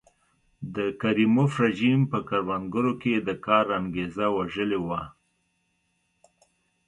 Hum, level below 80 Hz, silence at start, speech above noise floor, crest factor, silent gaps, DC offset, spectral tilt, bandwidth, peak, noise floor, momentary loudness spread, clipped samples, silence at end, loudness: none; -58 dBFS; 0.6 s; 48 dB; 20 dB; none; under 0.1%; -7.5 dB/octave; 10.5 kHz; -6 dBFS; -73 dBFS; 9 LU; under 0.1%; 1.75 s; -25 LUFS